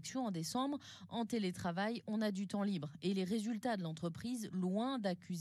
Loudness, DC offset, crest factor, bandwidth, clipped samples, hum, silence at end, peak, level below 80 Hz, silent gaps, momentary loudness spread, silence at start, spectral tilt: -40 LUFS; under 0.1%; 14 dB; 13.5 kHz; under 0.1%; none; 0 s; -26 dBFS; -80 dBFS; none; 5 LU; 0 s; -5.5 dB/octave